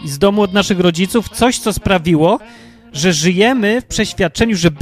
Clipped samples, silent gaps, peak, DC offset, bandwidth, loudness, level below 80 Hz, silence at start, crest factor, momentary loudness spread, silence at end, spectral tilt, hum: under 0.1%; none; 0 dBFS; under 0.1%; 15.5 kHz; -14 LUFS; -36 dBFS; 0 s; 14 dB; 5 LU; 0 s; -4.5 dB/octave; none